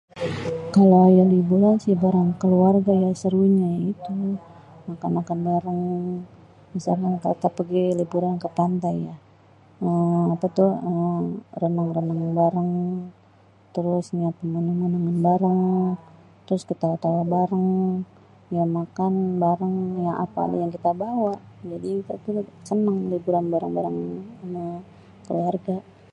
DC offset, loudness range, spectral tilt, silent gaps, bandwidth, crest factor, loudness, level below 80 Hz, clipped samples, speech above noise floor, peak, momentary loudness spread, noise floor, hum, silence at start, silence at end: under 0.1%; 7 LU; -9.5 dB/octave; none; 8.6 kHz; 18 dB; -23 LUFS; -60 dBFS; under 0.1%; 32 dB; -4 dBFS; 13 LU; -54 dBFS; none; 0.15 s; 0.3 s